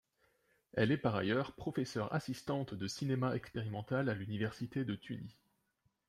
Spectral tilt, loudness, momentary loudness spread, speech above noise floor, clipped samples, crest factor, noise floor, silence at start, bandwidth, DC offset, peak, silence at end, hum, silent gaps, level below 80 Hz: -6.5 dB/octave; -38 LUFS; 8 LU; 43 dB; under 0.1%; 20 dB; -80 dBFS; 0.75 s; 14.5 kHz; under 0.1%; -18 dBFS; 0.75 s; none; none; -68 dBFS